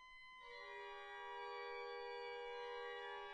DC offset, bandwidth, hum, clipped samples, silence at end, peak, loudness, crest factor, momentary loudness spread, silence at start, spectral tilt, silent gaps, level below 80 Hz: under 0.1%; 10 kHz; none; under 0.1%; 0 s; -40 dBFS; -51 LUFS; 12 dB; 6 LU; 0 s; -1.5 dB/octave; none; -78 dBFS